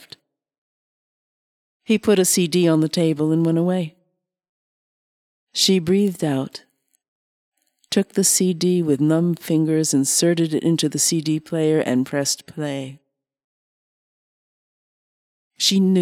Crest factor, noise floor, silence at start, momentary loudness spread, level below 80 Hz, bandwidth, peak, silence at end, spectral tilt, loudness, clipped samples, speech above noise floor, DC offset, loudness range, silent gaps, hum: 16 dB; -71 dBFS; 1.9 s; 9 LU; -66 dBFS; 17 kHz; -4 dBFS; 0 s; -4.5 dB/octave; -19 LUFS; under 0.1%; 53 dB; under 0.1%; 6 LU; 4.49-5.47 s, 7.08-7.52 s, 13.44-15.51 s; none